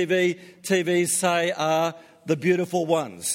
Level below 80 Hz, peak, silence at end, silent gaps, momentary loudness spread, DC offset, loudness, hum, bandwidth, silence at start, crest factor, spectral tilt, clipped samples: -70 dBFS; -8 dBFS; 0 s; none; 7 LU; under 0.1%; -23 LUFS; none; 16.5 kHz; 0 s; 16 dB; -4 dB/octave; under 0.1%